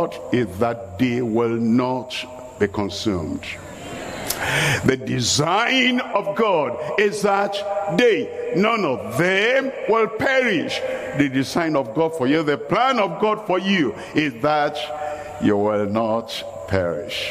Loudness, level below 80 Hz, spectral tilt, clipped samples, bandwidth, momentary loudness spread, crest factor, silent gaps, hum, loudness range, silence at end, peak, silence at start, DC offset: -21 LUFS; -54 dBFS; -4.5 dB/octave; under 0.1%; 15.5 kHz; 9 LU; 20 dB; none; none; 4 LU; 0 s; -2 dBFS; 0 s; under 0.1%